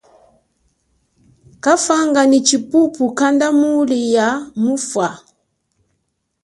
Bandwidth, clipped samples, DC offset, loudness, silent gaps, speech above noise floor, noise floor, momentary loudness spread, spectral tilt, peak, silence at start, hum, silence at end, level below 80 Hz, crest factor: 11.5 kHz; under 0.1%; under 0.1%; -15 LUFS; none; 55 dB; -70 dBFS; 7 LU; -3 dB/octave; 0 dBFS; 1.65 s; none; 1.25 s; -62 dBFS; 16 dB